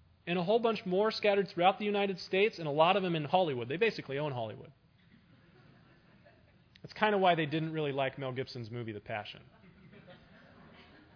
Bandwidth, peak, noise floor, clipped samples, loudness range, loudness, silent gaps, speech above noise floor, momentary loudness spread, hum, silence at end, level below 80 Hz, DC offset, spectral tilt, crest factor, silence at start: 5.4 kHz; -10 dBFS; -63 dBFS; under 0.1%; 10 LU; -32 LUFS; none; 32 dB; 13 LU; none; 0.35 s; -72 dBFS; under 0.1%; -7 dB/octave; 22 dB; 0.25 s